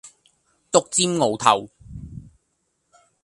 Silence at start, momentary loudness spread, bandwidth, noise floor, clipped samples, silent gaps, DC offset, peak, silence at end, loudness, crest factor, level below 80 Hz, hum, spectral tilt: 0.05 s; 23 LU; 11.5 kHz; -72 dBFS; under 0.1%; none; under 0.1%; 0 dBFS; 1 s; -20 LUFS; 24 dB; -52 dBFS; none; -3 dB/octave